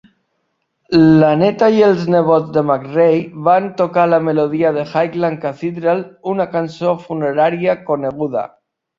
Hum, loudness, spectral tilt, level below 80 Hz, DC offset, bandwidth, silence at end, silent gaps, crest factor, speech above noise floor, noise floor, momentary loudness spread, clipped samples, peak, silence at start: none; -15 LUFS; -8.5 dB/octave; -54 dBFS; under 0.1%; 7.2 kHz; 0.5 s; none; 14 dB; 54 dB; -69 dBFS; 9 LU; under 0.1%; -2 dBFS; 0.9 s